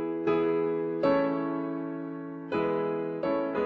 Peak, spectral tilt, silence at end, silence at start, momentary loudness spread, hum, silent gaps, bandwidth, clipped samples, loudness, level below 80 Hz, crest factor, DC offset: -12 dBFS; -9 dB/octave; 0 s; 0 s; 9 LU; none; none; 5.8 kHz; under 0.1%; -29 LUFS; -66 dBFS; 16 dB; under 0.1%